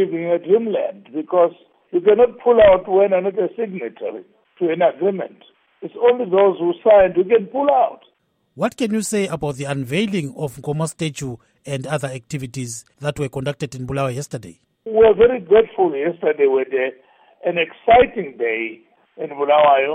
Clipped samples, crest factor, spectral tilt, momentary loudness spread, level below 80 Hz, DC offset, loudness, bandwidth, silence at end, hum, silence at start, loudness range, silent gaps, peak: under 0.1%; 16 dB; -5.5 dB/octave; 16 LU; -48 dBFS; under 0.1%; -18 LUFS; 15 kHz; 0 s; none; 0 s; 9 LU; none; -2 dBFS